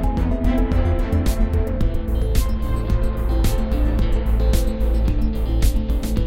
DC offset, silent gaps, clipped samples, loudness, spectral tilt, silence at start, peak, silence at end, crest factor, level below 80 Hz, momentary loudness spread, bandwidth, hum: 1%; none; under 0.1%; -22 LUFS; -7 dB/octave; 0 s; -4 dBFS; 0 s; 14 dB; -20 dBFS; 3 LU; 16 kHz; none